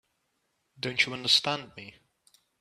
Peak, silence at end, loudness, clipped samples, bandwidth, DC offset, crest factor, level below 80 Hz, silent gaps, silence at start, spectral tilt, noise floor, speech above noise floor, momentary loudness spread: -8 dBFS; 0.7 s; -26 LUFS; under 0.1%; 14.5 kHz; under 0.1%; 24 dB; -70 dBFS; none; 0.8 s; -2 dB/octave; -77 dBFS; 48 dB; 21 LU